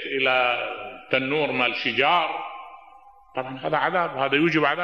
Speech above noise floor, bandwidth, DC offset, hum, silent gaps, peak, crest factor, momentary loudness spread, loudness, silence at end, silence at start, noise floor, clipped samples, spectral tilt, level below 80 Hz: 28 dB; 7.2 kHz; 0.1%; none; none; -6 dBFS; 20 dB; 13 LU; -23 LUFS; 0 s; 0 s; -51 dBFS; under 0.1%; -6 dB/octave; -66 dBFS